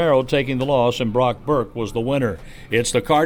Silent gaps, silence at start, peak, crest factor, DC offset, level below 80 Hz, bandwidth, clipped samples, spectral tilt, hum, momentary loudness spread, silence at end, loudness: none; 0 s; -4 dBFS; 16 dB; under 0.1%; -40 dBFS; 18.5 kHz; under 0.1%; -5 dB/octave; none; 7 LU; 0 s; -20 LUFS